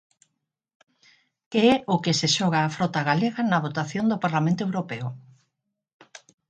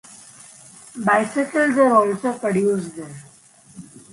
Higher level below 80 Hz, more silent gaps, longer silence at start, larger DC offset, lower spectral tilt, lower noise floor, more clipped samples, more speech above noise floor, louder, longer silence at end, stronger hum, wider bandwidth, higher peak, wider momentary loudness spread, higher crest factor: about the same, -66 dBFS vs -66 dBFS; neither; first, 1.5 s vs 0.1 s; neither; about the same, -5 dB/octave vs -6 dB/octave; first, -80 dBFS vs -50 dBFS; neither; first, 57 dB vs 31 dB; second, -24 LUFS vs -19 LUFS; first, 1.3 s vs 0.15 s; neither; second, 9.4 kHz vs 11.5 kHz; about the same, -6 dBFS vs -4 dBFS; second, 9 LU vs 24 LU; about the same, 20 dB vs 18 dB